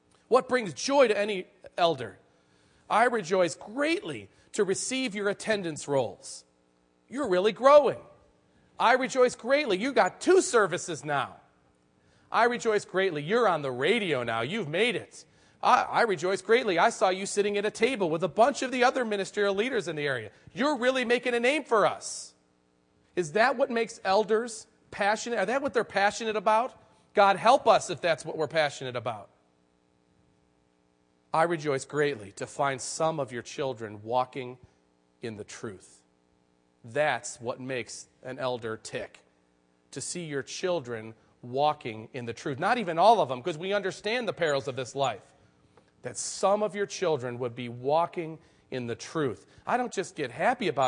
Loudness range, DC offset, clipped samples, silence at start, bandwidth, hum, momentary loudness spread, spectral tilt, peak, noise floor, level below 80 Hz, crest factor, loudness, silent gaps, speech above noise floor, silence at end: 9 LU; under 0.1%; under 0.1%; 0.3 s; 10.5 kHz; none; 15 LU; -4 dB/octave; -6 dBFS; -68 dBFS; -72 dBFS; 22 dB; -27 LUFS; none; 41 dB; 0 s